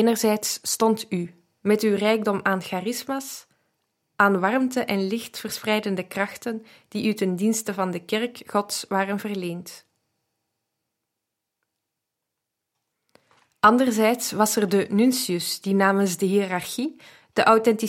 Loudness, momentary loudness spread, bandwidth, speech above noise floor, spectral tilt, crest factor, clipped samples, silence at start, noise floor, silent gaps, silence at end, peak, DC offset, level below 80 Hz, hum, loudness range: -23 LUFS; 11 LU; 16.5 kHz; 60 dB; -4 dB/octave; 20 dB; under 0.1%; 0 s; -83 dBFS; none; 0 s; -4 dBFS; under 0.1%; -72 dBFS; none; 8 LU